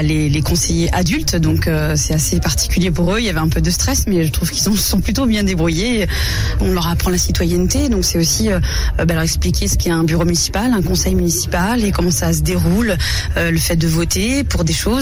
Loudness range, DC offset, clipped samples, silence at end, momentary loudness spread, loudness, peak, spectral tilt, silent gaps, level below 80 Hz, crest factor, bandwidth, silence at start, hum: 0 LU; 0.3%; under 0.1%; 0 s; 2 LU; -16 LUFS; -6 dBFS; -4.5 dB/octave; none; -22 dBFS; 10 dB; 17.5 kHz; 0 s; none